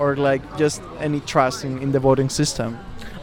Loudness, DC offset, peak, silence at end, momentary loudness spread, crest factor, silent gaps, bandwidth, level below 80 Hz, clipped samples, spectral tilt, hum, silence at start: -21 LUFS; under 0.1%; -4 dBFS; 0 s; 10 LU; 18 dB; none; 17 kHz; -44 dBFS; under 0.1%; -5 dB/octave; none; 0 s